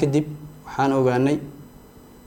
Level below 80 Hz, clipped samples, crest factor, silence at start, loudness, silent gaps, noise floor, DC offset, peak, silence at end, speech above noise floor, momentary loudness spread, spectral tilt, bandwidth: -52 dBFS; under 0.1%; 16 dB; 0 s; -22 LUFS; none; -46 dBFS; under 0.1%; -6 dBFS; 0.6 s; 26 dB; 17 LU; -7.5 dB/octave; 17 kHz